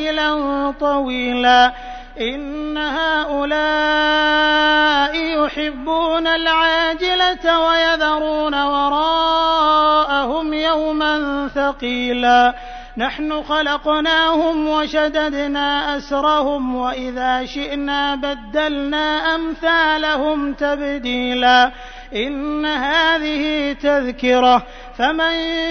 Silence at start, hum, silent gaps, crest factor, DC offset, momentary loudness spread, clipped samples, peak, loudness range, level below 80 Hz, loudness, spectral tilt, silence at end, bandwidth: 0 s; none; none; 16 dB; under 0.1%; 9 LU; under 0.1%; -2 dBFS; 3 LU; -40 dBFS; -17 LUFS; -3.5 dB/octave; 0 s; 6.6 kHz